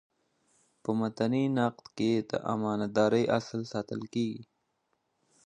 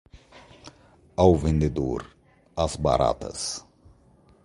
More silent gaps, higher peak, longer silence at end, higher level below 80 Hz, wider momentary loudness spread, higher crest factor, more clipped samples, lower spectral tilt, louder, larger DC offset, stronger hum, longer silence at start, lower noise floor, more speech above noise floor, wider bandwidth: neither; second, -12 dBFS vs -4 dBFS; first, 1.05 s vs 0.85 s; second, -70 dBFS vs -38 dBFS; second, 9 LU vs 15 LU; about the same, 20 dB vs 22 dB; neither; about the same, -6.5 dB/octave vs -6 dB/octave; second, -31 LUFS vs -25 LUFS; neither; neither; first, 0.9 s vs 0.15 s; first, -78 dBFS vs -57 dBFS; first, 48 dB vs 34 dB; second, 9.8 kHz vs 11.5 kHz